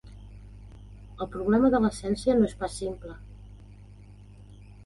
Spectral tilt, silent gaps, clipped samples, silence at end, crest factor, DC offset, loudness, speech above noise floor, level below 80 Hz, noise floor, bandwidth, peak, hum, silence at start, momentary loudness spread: -6.5 dB/octave; none; under 0.1%; 0.1 s; 18 dB; under 0.1%; -26 LUFS; 23 dB; -46 dBFS; -48 dBFS; 11.5 kHz; -10 dBFS; 50 Hz at -45 dBFS; 0.05 s; 26 LU